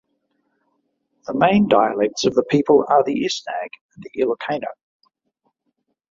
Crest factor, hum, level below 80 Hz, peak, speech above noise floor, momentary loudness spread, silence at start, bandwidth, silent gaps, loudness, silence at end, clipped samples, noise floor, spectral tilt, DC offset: 18 dB; none; -58 dBFS; -2 dBFS; 54 dB; 18 LU; 1.3 s; 7.6 kHz; 3.81-3.89 s; -19 LUFS; 1.4 s; under 0.1%; -73 dBFS; -5.5 dB/octave; under 0.1%